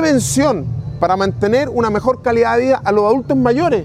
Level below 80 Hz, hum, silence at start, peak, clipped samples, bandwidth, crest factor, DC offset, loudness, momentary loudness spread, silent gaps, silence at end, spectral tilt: -40 dBFS; none; 0 s; 0 dBFS; under 0.1%; 15.5 kHz; 14 dB; under 0.1%; -15 LUFS; 3 LU; none; 0 s; -5.5 dB/octave